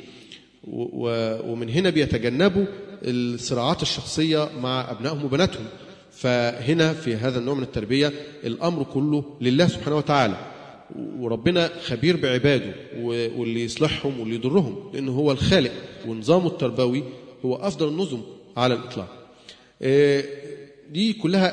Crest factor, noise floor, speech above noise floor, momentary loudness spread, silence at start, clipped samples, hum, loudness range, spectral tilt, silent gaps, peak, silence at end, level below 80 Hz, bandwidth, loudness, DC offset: 20 dB; -49 dBFS; 26 dB; 14 LU; 0 s; under 0.1%; none; 2 LU; -6 dB/octave; none; -4 dBFS; 0 s; -50 dBFS; 10.5 kHz; -23 LUFS; under 0.1%